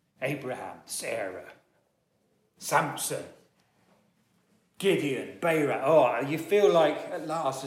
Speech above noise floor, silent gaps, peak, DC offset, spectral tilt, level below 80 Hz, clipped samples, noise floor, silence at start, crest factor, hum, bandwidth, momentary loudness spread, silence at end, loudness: 45 dB; none; -10 dBFS; under 0.1%; -4.5 dB/octave; -78 dBFS; under 0.1%; -72 dBFS; 0.2 s; 18 dB; none; 16.5 kHz; 15 LU; 0 s; -27 LUFS